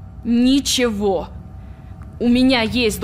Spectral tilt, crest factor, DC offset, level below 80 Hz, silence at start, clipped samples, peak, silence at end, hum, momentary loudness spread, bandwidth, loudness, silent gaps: -4 dB/octave; 12 dB; under 0.1%; -38 dBFS; 0 s; under 0.1%; -6 dBFS; 0 s; none; 22 LU; 15.5 kHz; -17 LUFS; none